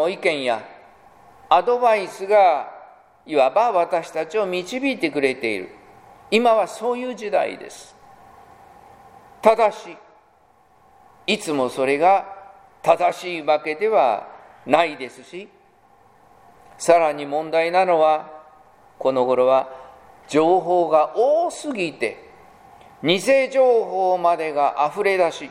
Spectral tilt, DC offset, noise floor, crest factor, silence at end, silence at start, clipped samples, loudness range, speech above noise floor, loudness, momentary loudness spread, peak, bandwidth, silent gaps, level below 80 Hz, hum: -4 dB/octave; under 0.1%; -56 dBFS; 20 dB; 0 s; 0 s; under 0.1%; 4 LU; 37 dB; -20 LUFS; 14 LU; 0 dBFS; 15.5 kHz; none; -66 dBFS; none